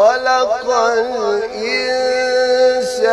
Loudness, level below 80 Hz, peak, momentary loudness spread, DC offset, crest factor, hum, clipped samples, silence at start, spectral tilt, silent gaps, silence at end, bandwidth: -15 LUFS; -52 dBFS; -2 dBFS; 5 LU; under 0.1%; 14 dB; none; under 0.1%; 0 s; -1.5 dB/octave; none; 0 s; 12 kHz